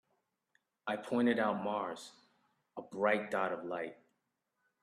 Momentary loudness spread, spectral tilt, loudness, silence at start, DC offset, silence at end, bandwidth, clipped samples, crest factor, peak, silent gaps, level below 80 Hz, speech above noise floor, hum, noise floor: 17 LU; -5.5 dB/octave; -35 LUFS; 0.85 s; under 0.1%; 0.9 s; 12.5 kHz; under 0.1%; 20 dB; -18 dBFS; none; -84 dBFS; 49 dB; none; -84 dBFS